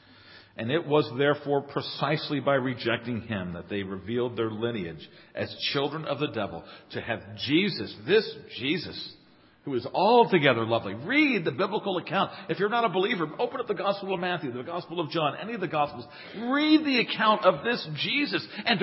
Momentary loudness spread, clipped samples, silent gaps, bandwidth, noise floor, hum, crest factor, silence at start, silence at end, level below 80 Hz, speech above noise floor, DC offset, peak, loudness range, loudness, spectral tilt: 13 LU; under 0.1%; none; 5.8 kHz; -52 dBFS; none; 22 dB; 0.25 s; 0 s; -62 dBFS; 25 dB; under 0.1%; -6 dBFS; 6 LU; -27 LUFS; -9.5 dB/octave